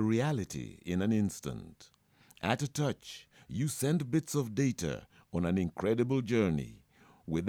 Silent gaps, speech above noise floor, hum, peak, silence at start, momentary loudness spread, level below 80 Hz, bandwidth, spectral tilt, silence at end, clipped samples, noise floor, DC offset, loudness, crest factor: none; 23 dB; none; -14 dBFS; 0 s; 14 LU; -58 dBFS; 18.5 kHz; -6 dB/octave; 0 s; under 0.1%; -55 dBFS; under 0.1%; -33 LUFS; 20 dB